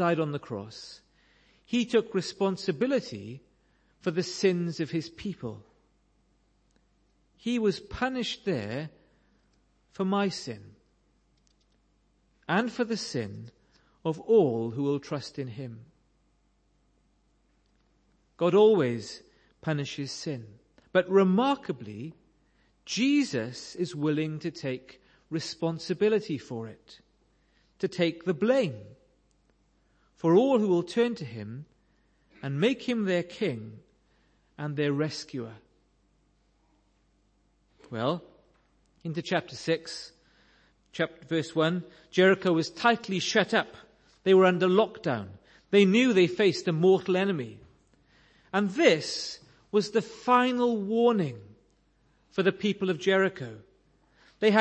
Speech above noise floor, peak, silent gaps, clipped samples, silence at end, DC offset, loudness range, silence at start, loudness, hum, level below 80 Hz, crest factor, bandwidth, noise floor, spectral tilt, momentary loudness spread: 42 dB; -6 dBFS; none; under 0.1%; 0 s; under 0.1%; 11 LU; 0 s; -28 LUFS; none; -66 dBFS; 22 dB; 8.8 kHz; -69 dBFS; -5.5 dB/octave; 18 LU